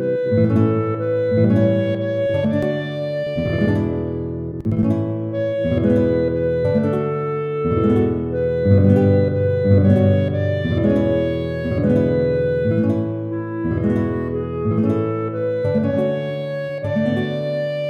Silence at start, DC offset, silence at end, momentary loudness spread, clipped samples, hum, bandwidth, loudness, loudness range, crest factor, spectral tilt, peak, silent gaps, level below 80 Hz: 0 s; under 0.1%; 0 s; 8 LU; under 0.1%; none; 5.2 kHz; -19 LUFS; 5 LU; 16 dB; -10 dB/octave; -2 dBFS; none; -40 dBFS